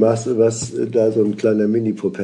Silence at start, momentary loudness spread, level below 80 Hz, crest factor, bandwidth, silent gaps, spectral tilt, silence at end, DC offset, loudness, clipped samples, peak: 0 s; 4 LU; -60 dBFS; 14 dB; 10.5 kHz; none; -6.5 dB/octave; 0 s; under 0.1%; -18 LUFS; under 0.1%; -2 dBFS